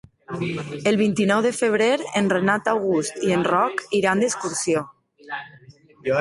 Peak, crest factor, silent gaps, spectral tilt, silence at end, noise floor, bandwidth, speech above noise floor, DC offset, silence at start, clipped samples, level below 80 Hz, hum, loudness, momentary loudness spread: -6 dBFS; 16 dB; none; -4.5 dB/octave; 0 s; -49 dBFS; 11.5 kHz; 28 dB; under 0.1%; 0.3 s; under 0.1%; -60 dBFS; none; -21 LUFS; 13 LU